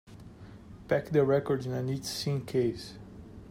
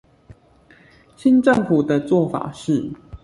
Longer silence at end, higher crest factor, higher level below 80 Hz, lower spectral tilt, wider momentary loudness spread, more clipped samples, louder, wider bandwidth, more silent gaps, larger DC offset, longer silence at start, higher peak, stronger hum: about the same, 0 s vs 0.05 s; about the same, 18 dB vs 16 dB; second, -58 dBFS vs -52 dBFS; second, -6 dB/octave vs -7.5 dB/octave; first, 23 LU vs 9 LU; neither; second, -30 LUFS vs -19 LUFS; first, 16 kHz vs 11.5 kHz; neither; neither; second, 0.05 s vs 1.2 s; second, -14 dBFS vs -4 dBFS; neither